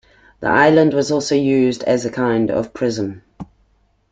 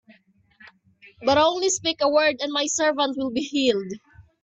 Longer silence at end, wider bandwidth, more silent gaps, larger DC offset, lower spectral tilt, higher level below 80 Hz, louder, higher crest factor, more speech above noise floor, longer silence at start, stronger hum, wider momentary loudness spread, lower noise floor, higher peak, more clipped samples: first, 0.7 s vs 0.2 s; about the same, 9.2 kHz vs 8.4 kHz; neither; neither; first, -5.5 dB/octave vs -2 dB/octave; first, -52 dBFS vs -60 dBFS; first, -17 LUFS vs -22 LUFS; about the same, 16 dB vs 18 dB; first, 43 dB vs 36 dB; second, 0.4 s vs 1.05 s; neither; first, 13 LU vs 9 LU; about the same, -59 dBFS vs -58 dBFS; first, 0 dBFS vs -6 dBFS; neither